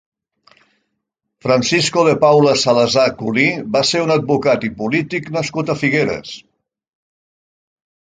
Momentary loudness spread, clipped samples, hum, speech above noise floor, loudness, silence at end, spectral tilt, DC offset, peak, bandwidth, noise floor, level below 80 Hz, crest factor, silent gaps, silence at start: 9 LU; under 0.1%; none; 60 dB; -15 LUFS; 1.6 s; -4.5 dB/octave; under 0.1%; 0 dBFS; 9.6 kHz; -75 dBFS; -54 dBFS; 16 dB; none; 1.45 s